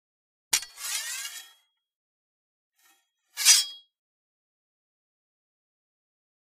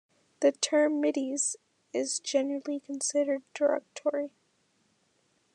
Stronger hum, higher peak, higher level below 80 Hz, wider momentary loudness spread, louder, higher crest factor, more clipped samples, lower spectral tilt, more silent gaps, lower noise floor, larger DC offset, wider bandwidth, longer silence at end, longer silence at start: neither; first, -2 dBFS vs -12 dBFS; first, -80 dBFS vs under -90 dBFS; first, 21 LU vs 10 LU; first, -23 LUFS vs -29 LUFS; first, 30 dB vs 18 dB; neither; second, 5.5 dB/octave vs -1 dB/octave; first, 1.95-2.72 s vs none; second, -67 dBFS vs -71 dBFS; neither; first, 15.5 kHz vs 11 kHz; first, 2.7 s vs 1.25 s; about the same, 0.5 s vs 0.4 s